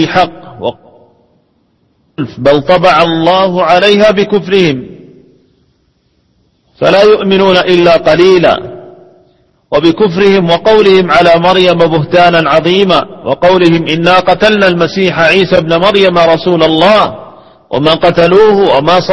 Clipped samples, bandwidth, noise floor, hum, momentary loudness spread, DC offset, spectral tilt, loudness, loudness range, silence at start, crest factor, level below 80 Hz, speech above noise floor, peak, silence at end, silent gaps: 1%; 11 kHz; -55 dBFS; none; 9 LU; under 0.1%; -6 dB/octave; -7 LUFS; 4 LU; 0 s; 8 dB; -40 dBFS; 48 dB; 0 dBFS; 0 s; none